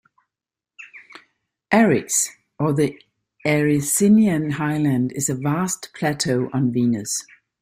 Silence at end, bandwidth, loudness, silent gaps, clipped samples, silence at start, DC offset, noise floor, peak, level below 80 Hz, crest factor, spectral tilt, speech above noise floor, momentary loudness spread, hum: 0.4 s; 16 kHz; -20 LUFS; none; under 0.1%; 0.8 s; under 0.1%; -89 dBFS; -2 dBFS; -58 dBFS; 18 dB; -5 dB/octave; 69 dB; 10 LU; none